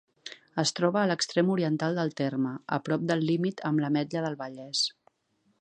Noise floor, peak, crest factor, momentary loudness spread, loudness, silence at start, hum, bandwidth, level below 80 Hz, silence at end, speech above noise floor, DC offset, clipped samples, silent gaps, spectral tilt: -72 dBFS; -10 dBFS; 20 dB; 7 LU; -28 LUFS; 0.25 s; none; 9.8 kHz; -76 dBFS; 0.7 s; 44 dB; under 0.1%; under 0.1%; none; -5 dB/octave